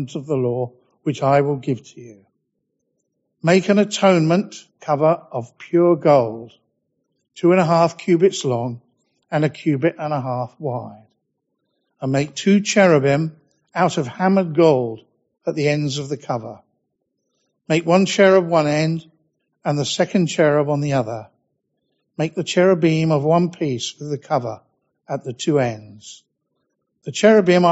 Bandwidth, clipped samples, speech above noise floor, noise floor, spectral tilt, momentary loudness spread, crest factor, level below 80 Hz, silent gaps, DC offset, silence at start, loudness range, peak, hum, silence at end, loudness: 8 kHz; under 0.1%; 56 dB; -74 dBFS; -5.5 dB/octave; 15 LU; 18 dB; -62 dBFS; none; under 0.1%; 0 s; 6 LU; 0 dBFS; none; 0 s; -18 LUFS